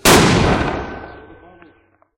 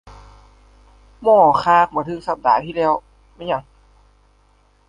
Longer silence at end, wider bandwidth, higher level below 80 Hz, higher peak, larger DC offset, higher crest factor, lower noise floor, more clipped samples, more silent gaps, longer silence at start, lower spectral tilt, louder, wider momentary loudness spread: second, 1 s vs 1.3 s; first, 17.5 kHz vs 10 kHz; first, -32 dBFS vs -50 dBFS; about the same, 0 dBFS vs -2 dBFS; neither; about the same, 16 dB vs 18 dB; about the same, -54 dBFS vs -56 dBFS; neither; neither; about the same, 0.05 s vs 0.05 s; second, -4 dB/octave vs -6.5 dB/octave; first, -14 LUFS vs -17 LUFS; first, 23 LU vs 12 LU